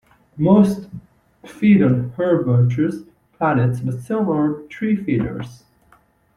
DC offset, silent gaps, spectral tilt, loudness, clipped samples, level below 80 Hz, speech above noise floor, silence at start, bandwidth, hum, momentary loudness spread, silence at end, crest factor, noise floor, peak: under 0.1%; none; -9 dB/octave; -18 LUFS; under 0.1%; -50 dBFS; 38 dB; 0.35 s; 11.5 kHz; none; 15 LU; 0.8 s; 16 dB; -56 dBFS; -2 dBFS